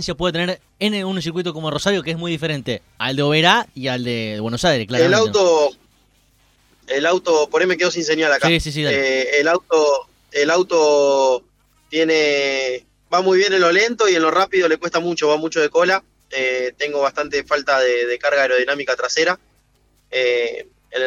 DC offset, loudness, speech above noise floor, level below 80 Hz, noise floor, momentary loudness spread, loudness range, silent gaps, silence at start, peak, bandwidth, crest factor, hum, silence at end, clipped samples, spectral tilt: under 0.1%; -18 LUFS; 42 dB; -48 dBFS; -59 dBFS; 9 LU; 3 LU; none; 0 s; 0 dBFS; 13.5 kHz; 18 dB; 50 Hz at -55 dBFS; 0 s; under 0.1%; -4 dB/octave